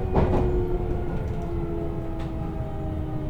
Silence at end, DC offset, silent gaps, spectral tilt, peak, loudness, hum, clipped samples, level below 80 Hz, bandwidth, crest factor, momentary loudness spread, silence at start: 0 s; under 0.1%; none; -9.5 dB/octave; -6 dBFS; -28 LUFS; none; under 0.1%; -30 dBFS; 7.4 kHz; 18 dB; 8 LU; 0 s